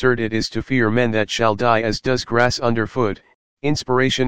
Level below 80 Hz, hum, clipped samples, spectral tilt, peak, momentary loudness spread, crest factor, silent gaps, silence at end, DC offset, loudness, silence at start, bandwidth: -44 dBFS; none; under 0.1%; -5 dB/octave; 0 dBFS; 6 LU; 18 dB; 3.35-3.57 s; 0 s; 2%; -19 LUFS; 0 s; 9.6 kHz